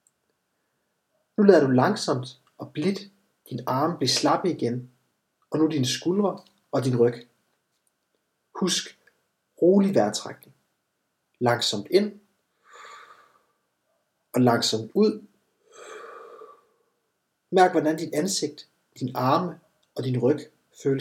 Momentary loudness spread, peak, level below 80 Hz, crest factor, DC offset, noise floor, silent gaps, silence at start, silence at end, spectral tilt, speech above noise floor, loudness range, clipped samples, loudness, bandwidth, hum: 21 LU; -2 dBFS; -82 dBFS; 24 dB; under 0.1%; -77 dBFS; none; 1.4 s; 0 s; -5 dB/octave; 54 dB; 4 LU; under 0.1%; -24 LUFS; 16.5 kHz; none